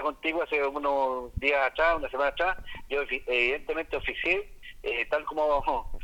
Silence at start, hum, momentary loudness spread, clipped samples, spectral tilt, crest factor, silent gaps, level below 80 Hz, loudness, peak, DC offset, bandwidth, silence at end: 0 s; none; 7 LU; under 0.1%; -5 dB/octave; 18 dB; none; -44 dBFS; -28 LUFS; -10 dBFS; under 0.1%; 17 kHz; 0 s